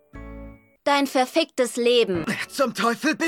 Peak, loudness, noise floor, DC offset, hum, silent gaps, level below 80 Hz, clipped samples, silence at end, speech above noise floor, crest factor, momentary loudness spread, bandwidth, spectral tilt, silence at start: -8 dBFS; -22 LUFS; -43 dBFS; under 0.1%; none; none; -50 dBFS; under 0.1%; 0 s; 21 dB; 16 dB; 21 LU; 17 kHz; -3.5 dB/octave; 0.15 s